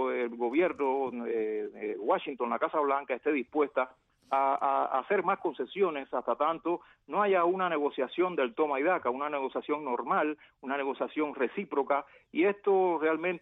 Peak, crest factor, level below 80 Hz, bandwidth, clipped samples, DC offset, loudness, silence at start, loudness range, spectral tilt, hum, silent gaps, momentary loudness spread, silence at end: -16 dBFS; 14 dB; -76 dBFS; 4 kHz; under 0.1%; under 0.1%; -30 LUFS; 0 s; 2 LU; -8 dB/octave; none; none; 7 LU; 0.05 s